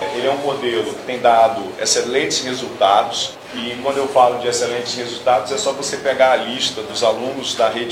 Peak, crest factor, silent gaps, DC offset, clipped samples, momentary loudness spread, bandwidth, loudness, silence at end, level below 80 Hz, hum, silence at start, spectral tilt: -2 dBFS; 16 dB; none; under 0.1%; under 0.1%; 8 LU; 16 kHz; -18 LUFS; 0 s; -60 dBFS; none; 0 s; -2 dB/octave